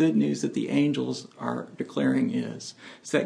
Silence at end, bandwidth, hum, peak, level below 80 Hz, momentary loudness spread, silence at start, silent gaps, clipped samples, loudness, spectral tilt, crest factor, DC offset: 0 s; 10.5 kHz; none; -8 dBFS; -74 dBFS; 12 LU; 0 s; none; under 0.1%; -27 LUFS; -6 dB/octave; 18 dB; under 0.1%